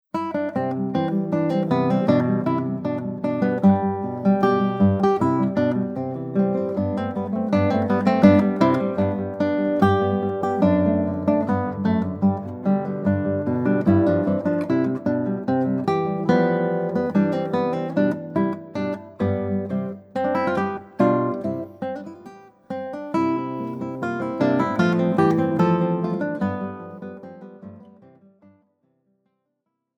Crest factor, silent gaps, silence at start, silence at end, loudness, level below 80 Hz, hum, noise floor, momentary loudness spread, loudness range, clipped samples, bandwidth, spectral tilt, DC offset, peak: 22 dB; none; 0.15 s; 2.15 s; -22 LUFS; -60 dBFS; none; -77 dBFS; 10 LU; 5 LU; under 0.1%; 7.4 kHz; -9 dB/octave; under 0.1%; 0 dBFS